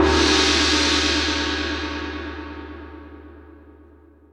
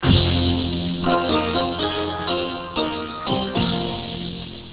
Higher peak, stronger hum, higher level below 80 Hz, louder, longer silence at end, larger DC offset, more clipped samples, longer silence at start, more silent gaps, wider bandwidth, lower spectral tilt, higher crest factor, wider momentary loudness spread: about the same, -4 dBFS vs -4 dBFS; neither; about the same, -34 dBFS vs -34 dBFS; first, -19 LUFS vs -22 LUFS; first, 0.6 s vs 0 s; neither; neither; about the same, 0 s vs 0 s; neither; first, 12.5 kHz vs 4 kHz; second, -3 dB/octave vs -10.5 dB/octave; about the same, 20 dB vs 18 dB; first, 22 LU vs 8 LU